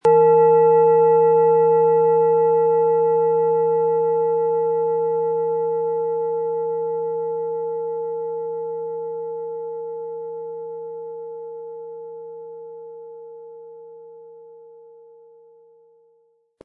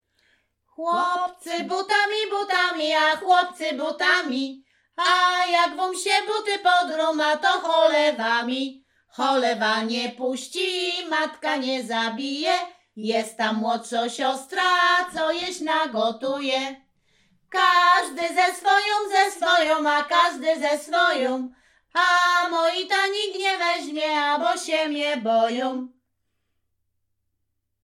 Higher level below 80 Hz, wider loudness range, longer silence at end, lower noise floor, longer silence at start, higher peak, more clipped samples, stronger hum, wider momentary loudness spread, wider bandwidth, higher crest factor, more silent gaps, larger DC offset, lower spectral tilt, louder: second, -80 dBFS vs -74 dBFS; first, 21 LU vs 5 LU; about the same, 2.05 s vs 1.95 s; second, -62 dBFS vs -75 dBFS; second, 0.05 s vs 0.8 s; about the same, -6 dBFS vs -6 dBFS; neither; neither; first, 22 LU vs 8 LU; second, 2.8 kHz vs 15.5 kHz; about the same, 14 dB vs 16 dB; neither; neither; first, -9.5 dB/octave vs -2 dB/octave; first, -19 LUFS vs -22 LUFS